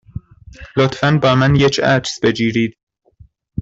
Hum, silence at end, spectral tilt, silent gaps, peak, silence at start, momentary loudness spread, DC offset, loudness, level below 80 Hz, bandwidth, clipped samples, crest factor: none; 0 s; -6 dB/octave; 2.83-2.87 s; -2 dBFS; 0.6 s; 14 LU; under 0.1%; -15 LUFS; -42 dBFS; 7.8 kHz; under 0.1%; 16 dB